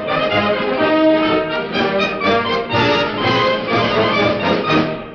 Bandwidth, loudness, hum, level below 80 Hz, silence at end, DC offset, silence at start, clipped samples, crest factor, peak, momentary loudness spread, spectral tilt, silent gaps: 6.8 kHz; -16 LUFS; none; -44 dBFS; 0 s; under 0.1%; 0 s; under 0.1%; 12 dB; -4 dBFS; 4 LU; -6 dB/octave; none